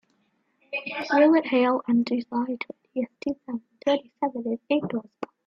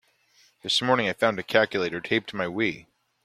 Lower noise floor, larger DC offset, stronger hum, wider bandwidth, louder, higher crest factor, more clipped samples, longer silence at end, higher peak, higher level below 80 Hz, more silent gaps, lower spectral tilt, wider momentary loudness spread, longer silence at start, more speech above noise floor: first, -70 dBFS vs -62 dBFS; neither; neither; second, 7 kHz vs 15 kHz; about the same, -26 LUFS vs -25 LUFS; second, 18 dB vs 24 dB; neither; second, 0.2 s vs 0.45 s; second, -8 dBFS vs -4 dBFS; about the same, -70 dBFS vs -66 dBFS; neither; first, -6.5 dB/octave vs -4 dB/octave; first, 14 LU vs 8 LU; about the same, 0.7 s vs 0.65 s; first, 45 dB vs 37 dB